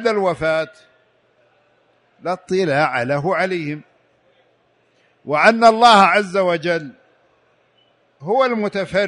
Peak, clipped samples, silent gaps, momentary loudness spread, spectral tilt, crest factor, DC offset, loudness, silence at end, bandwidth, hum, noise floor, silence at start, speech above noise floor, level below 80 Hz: 0 dBFS; under 0.1%; none; 19 LU; -5 dB/octave; 18 dB; under 0.1%; -16 LUFS; 0 s; 11 kHz; none; -60 dBFS; 0 s; 44 dB; -58 dBFS